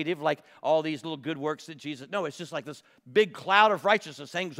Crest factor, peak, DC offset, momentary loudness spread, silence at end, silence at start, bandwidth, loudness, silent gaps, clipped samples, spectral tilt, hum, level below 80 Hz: 24 dB; -4 dBFS; under 0.1%; 16 LU; 0 s; 0 s; 15.5 kHz; -27 LUFS; none; under 0.1%; -4.5 dB/octave; none; -84 dBFS